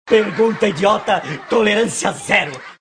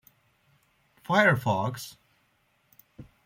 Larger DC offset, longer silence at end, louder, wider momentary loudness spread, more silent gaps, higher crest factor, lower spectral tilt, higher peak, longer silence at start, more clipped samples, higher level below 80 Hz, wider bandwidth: neither; second, 0.1 s vs 0.25 s; first, -17 LUFS vs -25 LUFS; second, 5 LU vs 21 LU; neither; second, 16 dB vs 22 dB; second, -4 dB/octave vs -5.5 dB/octave; first, 0 dBFS vs -8 dBFS; second, 0.05 s vs 1.1 s; neither; first, -54 dBFS vs -66 dBFS; second, 10.5 kHz vs 16.5 kHz